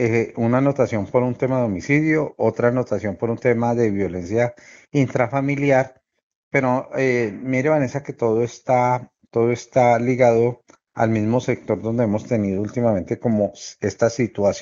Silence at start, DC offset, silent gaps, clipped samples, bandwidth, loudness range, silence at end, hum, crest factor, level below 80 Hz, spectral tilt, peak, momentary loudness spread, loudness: 0 s; under 0.1%; 6.23-6.51 s; under 0.1%; 7.6 kHz; 2 LU; 0 s; none; 18 dB; -56 dBFS; -7 dB/octave; -2 dBFS; 6 LU; -20 LUFS